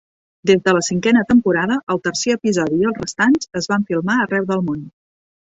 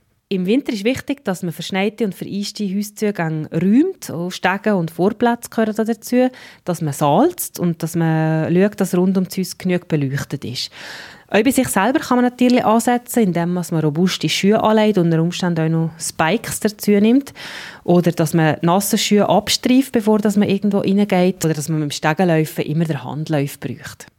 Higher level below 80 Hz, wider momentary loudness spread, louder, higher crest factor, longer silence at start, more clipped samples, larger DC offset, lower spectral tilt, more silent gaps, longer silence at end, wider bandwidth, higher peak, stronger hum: about the same, -54 dBFS vs -58 dBFS; second, 6 LU vs 10 LU; about the same, -17 LUFS vs -18 LUFS; about the same, 16 dB vs 18 dB; first, 0.45 s vs 0.3 s; neither; neither; about the same, -5 dB/octave vs -5.5 dB/octave; first, 1.83-1.87 s vs none; first, 0.7 s vs 0.15 s; second, 8 kHz vs 17 kHz; about the same, -2 dBFS vs 0 dBFS; neither